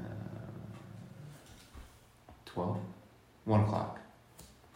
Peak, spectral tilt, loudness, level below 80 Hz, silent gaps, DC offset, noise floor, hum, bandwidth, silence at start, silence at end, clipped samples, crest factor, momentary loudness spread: -16 dBFS; -8 dB/octave; -37 LUFS; -60 dBFS; none; under 0.1%; -59 dBFS; none; 15 kHz; 0 s; 0.1 s; under 0.1%; 22 dB; 26 LU